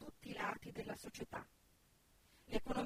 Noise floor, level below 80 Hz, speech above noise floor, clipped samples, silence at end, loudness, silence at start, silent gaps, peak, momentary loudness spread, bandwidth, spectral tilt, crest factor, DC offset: -72 dBFS; -60 dBFS; 28 dB; under 0.1%; 0 s; -47 LUFS; 0 s; none; -24 dBFS; 8 LU; 15.5 kHz; -4.5 dB/octave; 22 dB; under 0.1%